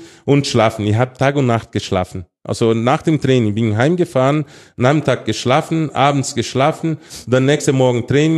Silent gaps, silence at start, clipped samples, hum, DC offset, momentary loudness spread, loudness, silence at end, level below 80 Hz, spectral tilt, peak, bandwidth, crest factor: none; 0 s; under 0.1%; none; under 0.1%; 6 LU; -16 LUFS; 0 s; -50 dBFS; -6 dB/octave; 0 dBFS; 12.5 kHz; 14 dB